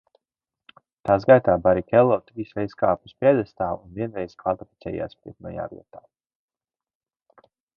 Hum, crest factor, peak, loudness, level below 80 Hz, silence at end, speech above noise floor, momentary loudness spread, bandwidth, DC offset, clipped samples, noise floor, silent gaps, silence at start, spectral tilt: none; 22 dB; -2 dBFS; -22 LUFS; -52 dBFS; 2 s; over 68 dB; 17 LU; 5.8 kHz; under 0.1%; under 0.1%; under -90 dBFS; none; 1.05 s; -9.5 dB/octave